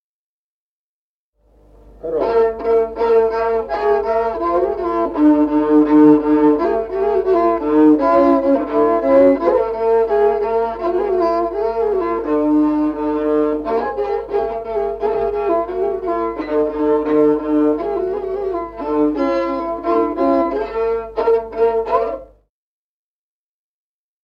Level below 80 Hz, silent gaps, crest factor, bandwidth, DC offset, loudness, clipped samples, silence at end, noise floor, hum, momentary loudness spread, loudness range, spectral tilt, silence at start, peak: -44 dBFS; none; 16 dB; 5.6 kHz; under 0.1%; -17 LUFS; under 0.1%; 2 s; under -90 dBFS; 50 Hz at -45 dBFS; 8 LU; 6 LU; -8 dB/octave; 2.05 s; -2 dBFS